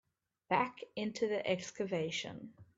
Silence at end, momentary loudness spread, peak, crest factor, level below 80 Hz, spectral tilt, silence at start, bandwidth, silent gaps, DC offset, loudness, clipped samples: 0.15 s; 7 LU; -16 dBFS; 22 dB; -78 dBFS; -4.5 dB/octave; 0.5 s; 7.8 kHz; none; under 0.1%; -37 LUFS; under 0.1%